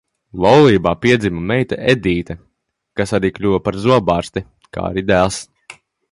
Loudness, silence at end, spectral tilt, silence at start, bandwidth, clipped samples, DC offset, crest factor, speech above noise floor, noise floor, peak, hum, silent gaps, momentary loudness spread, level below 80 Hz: -16 LUFS; 0.4 s; -6 dB/octave; 0.35 s; 11.5 kHz; under 0.1%; under 0.1%; 16 dB; 48 dB; -63 dBFS; 0 dBFS; none; none; 17 LU; -40 dBFS